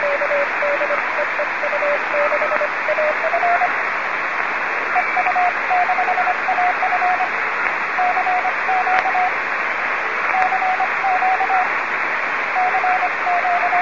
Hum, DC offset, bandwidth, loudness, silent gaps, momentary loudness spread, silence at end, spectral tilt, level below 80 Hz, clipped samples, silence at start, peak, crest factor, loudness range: none; 0.8%; 7.4 kHz; -18 LUFS; none; 3 LU; 0 s; -3 dB/octave; -60 dBFS; under 0.1%; 0 s; 0 dBFS; 18 dB; 1 LU